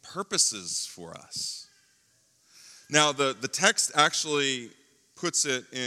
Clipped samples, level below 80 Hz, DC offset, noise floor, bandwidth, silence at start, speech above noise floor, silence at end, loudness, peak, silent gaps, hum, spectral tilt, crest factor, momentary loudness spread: under 0.1%; -80 dBFS; under 0.1%; -66 dBFS; 16.5 kHz; 0.05 s; 38 dB; 0 s; -25 LUFS; -4 dBFS; none; none; -1 dB/octave; 26 dB; 12 LU